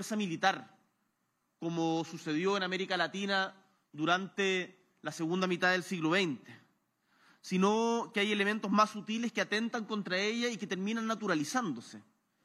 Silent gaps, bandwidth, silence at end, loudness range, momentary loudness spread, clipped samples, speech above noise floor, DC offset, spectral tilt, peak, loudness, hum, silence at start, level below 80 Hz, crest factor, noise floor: none; 13.5 kHz; 0.45 s; 3 LU; 10 LU; under 0.1%; 47 dB; under 0.1%; -4.5 dB/octave; -12 dBFS; -32 LUFS; none; 0 s; under -90 dBFS; 22 dB; -80 dBFS